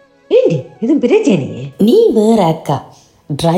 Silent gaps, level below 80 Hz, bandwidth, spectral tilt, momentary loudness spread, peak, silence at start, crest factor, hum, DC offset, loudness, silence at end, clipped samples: none; -50 dBFS; 15.5 kHz; -7 dB/octave; 11 LU; 0 dBFS; 0.3 s; 12 dB; none; under 0.1%; -12 LUFS; 0 s; under 0.1%